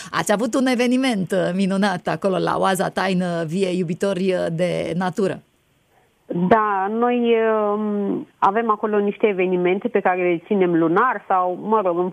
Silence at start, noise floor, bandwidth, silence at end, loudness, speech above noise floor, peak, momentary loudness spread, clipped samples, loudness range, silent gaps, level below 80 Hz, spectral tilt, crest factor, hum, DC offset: 0 s; -61 dBFS; 13.5 kHz; 0 s; -20 LUFS; 41 dB; -4 dBFS; 5 LU; under 0.1%; 3 LU; none; -62 dBFS; -6 dB/octave; 16 dB; none; under 0.1%